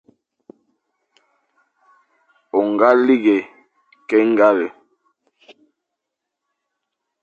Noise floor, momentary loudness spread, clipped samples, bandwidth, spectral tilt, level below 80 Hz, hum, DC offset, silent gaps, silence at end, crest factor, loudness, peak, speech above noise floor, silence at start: -81 dBFS; 14 LU; under 0.1%; 7 kHz; -7 dB/octave; -72 dBFS; none; under 0.1%; none; 2.55 s; 20 dB; -16 LUFS; 0 dBFS; 66 dB; 2.55 s